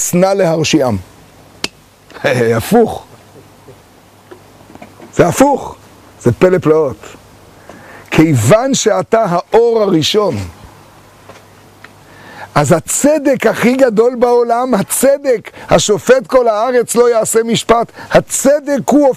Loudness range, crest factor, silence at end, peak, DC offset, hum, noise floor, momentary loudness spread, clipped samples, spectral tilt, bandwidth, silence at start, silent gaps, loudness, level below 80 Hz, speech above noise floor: 6 LU; 12 dB; 0 s; 0 dBFS; under 0.1%; none; -43 dBFS; 9 LU; under 0.1%; -4.5 dB/octave; 15.5 kHz; 0 s; none; -12 LUFS; -42 dBFS; 32 dB